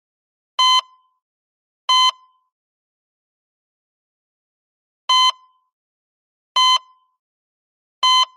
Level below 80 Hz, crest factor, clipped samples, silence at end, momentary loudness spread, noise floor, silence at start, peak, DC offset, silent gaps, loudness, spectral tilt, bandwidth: under -90 dBFS; 16 dB; under 0.1%; 0.1 s; 10 LU; under -90 dBFS; 0.6 s; -6 dBFS; under 0.1%; 1.22-1.88 s, 2.52-5.08 s, 5.73-6.55 s, 7.19-8.02 s; -16 LUFS; 8 dB/octave; 14 kHz